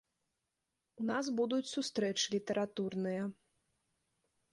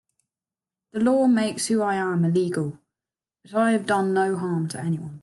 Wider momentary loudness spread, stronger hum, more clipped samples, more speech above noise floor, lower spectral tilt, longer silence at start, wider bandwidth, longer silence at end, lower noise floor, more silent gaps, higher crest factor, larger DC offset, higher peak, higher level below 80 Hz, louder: second, 5 LU vs 9 LU; neither; neither; second, 51 dB vs over 68 dB; second, -4 dB/octave vs -6 dB/octave; about the same, 1 s vs 0.95 s; about the same, 11.5 kHz vs 12.5 kHz; first, 1.2 s vs 0.05 s; about the same, -87 dBFS vs under -90 dBFS; neither; about the same, 18 dB vs 14 dB; neither; second, -22 dBFS vs -10 dBFS; second, -80 dBFS vs -68 dBFS; second, -36 LUFS vs -23 LUFS